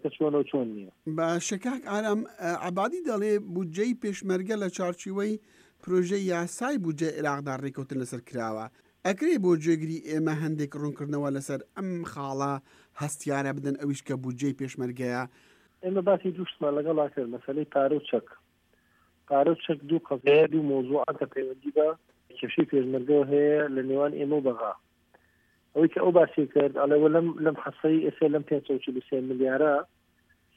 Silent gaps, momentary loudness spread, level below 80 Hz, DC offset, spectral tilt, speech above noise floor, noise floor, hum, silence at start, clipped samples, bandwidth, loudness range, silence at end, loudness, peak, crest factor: none; 11 LU; -74 dBFS; under 0.1%; -6 dB/octave; 40 dB; -67 dBFS; none; 0.05 s; under 0.1%; 15 kHz; 7 LU; 0.7 s; -28 LUFS; -8 dBFS; 20 dB